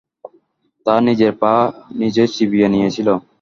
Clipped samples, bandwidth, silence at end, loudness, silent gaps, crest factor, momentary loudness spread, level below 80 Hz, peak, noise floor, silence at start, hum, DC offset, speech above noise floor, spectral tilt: under 0.1%; 7.2 kHz; 0.2 s; -16 LUFS; none; 16 dB; 6 LU; -54 dBFS; 0 dBFS; -59 dBFS; 0.25 s; none; under 0.1%; 44 dB; -6.5 dB/octave